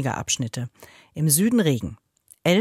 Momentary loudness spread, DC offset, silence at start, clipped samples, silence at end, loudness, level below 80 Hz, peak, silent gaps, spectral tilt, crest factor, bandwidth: 18 LU; under 0.1%; 0 s; under 0.1%; 0 s; -22 LUFS; -54 dBFS; -4 dBFS; none; -4.5 dB/octave; 18 dB; 16.5 kHz